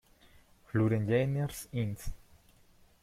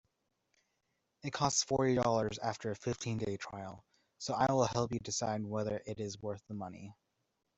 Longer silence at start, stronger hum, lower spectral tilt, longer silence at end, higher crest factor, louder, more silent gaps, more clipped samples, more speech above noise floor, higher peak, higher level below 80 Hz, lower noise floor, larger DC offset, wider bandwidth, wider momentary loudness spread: second, 0.75 s vs 1.25 s; neither; first, -7 dB/octave vs -4.5 dB/octave; first, 0.85 s vs 0.65 s; about the same, 18 dB vs 22 dB; first, -32 LUFS vs -35 LUFS; neither; neither; second, 32 dB vs 47 dB; about the same, -16 dBFS vs -16 dBFS; first, -50 dBFS vs -66 dBFS; second, -62 dBFS vs -83 dBFS; neither; first, 15.5 kHz vs 8.2 kHz; second, 11 LU vs 15 LU